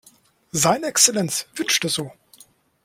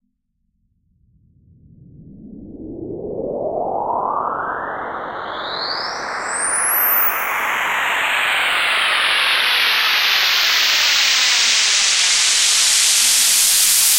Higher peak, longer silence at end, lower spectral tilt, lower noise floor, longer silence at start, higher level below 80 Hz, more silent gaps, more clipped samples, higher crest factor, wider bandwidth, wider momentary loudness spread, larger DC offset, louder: about the same, 0 dBFS vs -2 dBFS; first, 0.75 s vs 0 s; first, -2 dB/octave vs 1.5 dB/octave; second, -56 dBFS vs -69 dBFS; second, 0.55 s vs 2 s; second, -60 dBFS vs -54 dBFS; neither; neither; first, 22 dB vs 16 dB; about the same, 16.5 kHz vs 16 kHz; second, 11 LU vs 15 LU; neither; second, -19 LUFS vs -14 LUFS